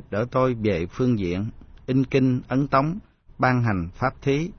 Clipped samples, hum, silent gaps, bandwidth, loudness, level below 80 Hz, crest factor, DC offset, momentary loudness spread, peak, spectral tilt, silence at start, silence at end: under 0.1%; none; none; 6.6 kHz; -23 LUFS; -46 dBFS; 18 dB; under 0.1%; 8 LU; -6 dBFS; -8 dB/octave; 0.1 s; 0.05 s